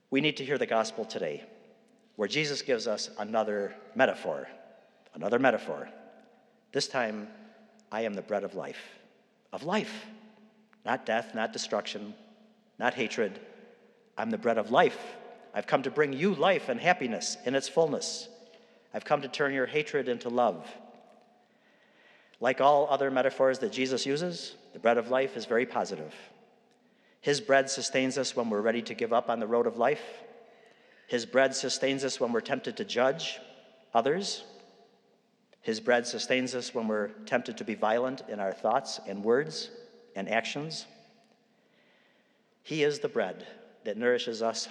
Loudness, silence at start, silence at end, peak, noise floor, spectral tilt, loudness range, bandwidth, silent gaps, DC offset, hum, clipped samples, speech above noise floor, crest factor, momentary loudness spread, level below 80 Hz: -30 LUFS; 0.1 s; 0 s; -8 dBFS; -68 dBFS; -3.5 dB/octave; 7 LU; 11.5 kHz; none; under 0.1%; none; under 0.1%; 38 dB; 22 dB; 15 LU; under -90 dBFS